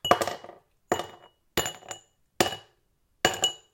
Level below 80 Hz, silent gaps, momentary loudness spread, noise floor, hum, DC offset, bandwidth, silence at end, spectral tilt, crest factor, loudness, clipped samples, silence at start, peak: -58 dBFS; none; 18 LU; -70 dBFS; none; under 0.1%; 17 kHz; 0.15 s; -2 dB/octave; 28 dB; -28 LUFS; under 0.1%; 0.05 s; -4 dBFS